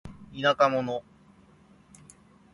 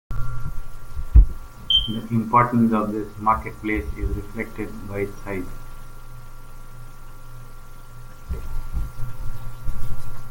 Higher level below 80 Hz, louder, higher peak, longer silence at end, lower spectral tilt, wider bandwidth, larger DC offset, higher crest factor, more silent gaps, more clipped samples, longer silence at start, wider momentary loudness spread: second, -60 dBFS vs -26 dBFS; about the same, -26 LUFS vs -24 LUFS; second, -8 dBFS vs -2 dBFS; first, 1.55 s vs 0 s; about the same, -5 dB/octave vs -6 dB/octave; second, 11.5 kHz vs 17 kHz; neither; about the same, 22 dB vs 20 dB; neither; neither; about the same, 0.05 s vs 0.1 s; second, 15 LU vs 25 LU